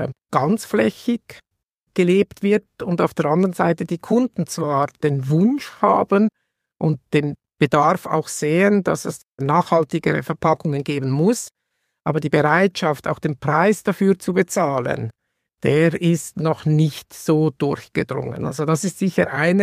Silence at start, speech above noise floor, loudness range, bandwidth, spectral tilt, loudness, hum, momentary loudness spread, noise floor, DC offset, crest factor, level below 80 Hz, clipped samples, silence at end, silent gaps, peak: 0 s; 56 dB; 2 LU; 15.5 kHz; -6.5 dB/octave; -20 LUFS; none; 8 LU; -75 dBFS; under 0.1%; 18 dB; -58 dBFS; under 0.1%; 0 s; 1.83-1.87 s, 9.28-9.33 s; -2 dBFS